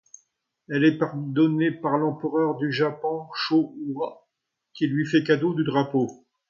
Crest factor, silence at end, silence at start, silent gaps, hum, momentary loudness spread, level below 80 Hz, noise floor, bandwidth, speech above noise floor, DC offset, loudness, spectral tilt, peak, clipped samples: 18 dB; 0.35 s; 0.7 s; none; none; 9 LU; -72 dBFS; -80 dBFS; 7.2 kHz; 57 dB; under 0.1%; -24 LUFS; -7 dB/octave; -8 dBFS; under 0.1%